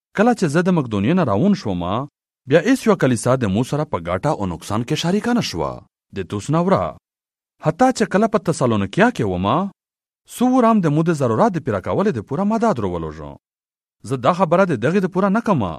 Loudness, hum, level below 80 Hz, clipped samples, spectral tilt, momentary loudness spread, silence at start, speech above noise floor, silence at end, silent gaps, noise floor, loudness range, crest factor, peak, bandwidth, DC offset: -19 LUFS; none; -50 dBFS; under 0.1%; -6.5 dB/octave; 11 LU; 0.15 s; over 72 dB; 0 s; none; under -90 dBFS; 3 LU; 18 dB; 0 dBFS; 14 kHz; under 0.1%